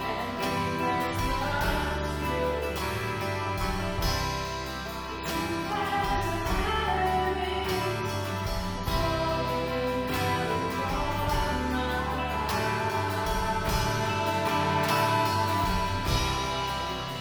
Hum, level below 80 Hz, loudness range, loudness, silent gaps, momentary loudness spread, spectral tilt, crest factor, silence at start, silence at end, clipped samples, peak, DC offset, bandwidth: none; -38 dBFS; 3 LU; -28 LUFS; none; 5 LU; -4.5 dB/octave; 16 dB; 0 s; 0 s; under 0.1%; -12 dBFS; under 0.1%; over 20 kHz